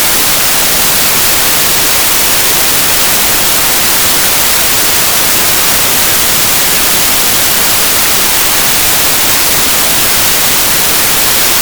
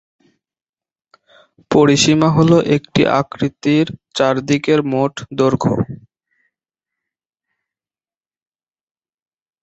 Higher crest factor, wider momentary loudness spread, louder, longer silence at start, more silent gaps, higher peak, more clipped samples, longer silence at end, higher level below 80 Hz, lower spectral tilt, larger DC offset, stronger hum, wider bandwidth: second, 8 dB vs 18 dB; second, 0 LU vs 10 LU; first, -6 LUFS vs -15 LUFS; second, 0 s vs 1.7 s; neither; about the same, 0 dBFS vs 0 dBFS; first, 2% vs under 0.1%; second, 0 s vs 3.65 s; first, -32 dBFS vs -50 dBFS; second, -0.5 dB/octave vs -5.5 dB/octave; first, 2% vs under 0.1%; neither; first, over 20 kHz vs 8.2 kHz